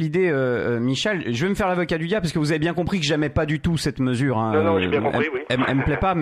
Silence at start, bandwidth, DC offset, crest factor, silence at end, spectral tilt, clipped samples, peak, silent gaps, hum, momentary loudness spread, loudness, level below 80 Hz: 0 s; 13.5 kHz; under 0.1%; 14 dB; 0 s; -6 dB/octave; under 0.1%; -6 dBFS; none; none; 3 LU; -22 LUFS; -42 dBFS